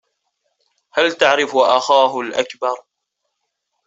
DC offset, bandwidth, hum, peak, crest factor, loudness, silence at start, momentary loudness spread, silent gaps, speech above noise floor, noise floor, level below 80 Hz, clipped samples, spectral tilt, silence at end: under 0.1%; 8 kHz; none; 0 dBFS; 18 dB; -16 LUFS; 0.95 s; 10 LU; none; 60 dB; -76 dBFS; -66 dBFS; under 0.1%; -2 dB/octave; 1.05 s